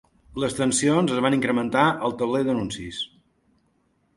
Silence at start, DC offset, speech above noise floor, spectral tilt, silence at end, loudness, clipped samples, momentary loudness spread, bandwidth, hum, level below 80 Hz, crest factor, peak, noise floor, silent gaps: 0.35 s; under 0.1%; 44 dB; -4.5 dB/octave; 1.1 s; -23 LUFS; under 0.1%; 12 LU; 11.5 kHz; none; -54 dBFS; 20 dB; -4 dBFS; -67 dBFS; none